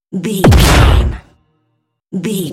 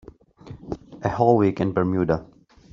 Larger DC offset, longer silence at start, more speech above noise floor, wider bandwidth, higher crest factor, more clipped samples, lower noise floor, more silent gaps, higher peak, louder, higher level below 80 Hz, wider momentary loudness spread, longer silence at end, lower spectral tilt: neither; second, 0.15 s vs 0.45 s; first, 56 dB vs 23 dB; first, 16.5 kHz vs 7.2 kHz; second, 12 dB vs 20 dB; first, 0.2% vs under 0.1%; first, -66 dBFS vs -44 dBFS; neither; first, 0 dBFS vs -4 dBFS; first, -11 LUFS vs -22 LUFS; first, -16 dBFS vs -50 dBFS; about the same, 16 LU vs 18 LU; second, 0 s vs 0.5 s; second, -5.5 dB/octave vs -8 dB/octave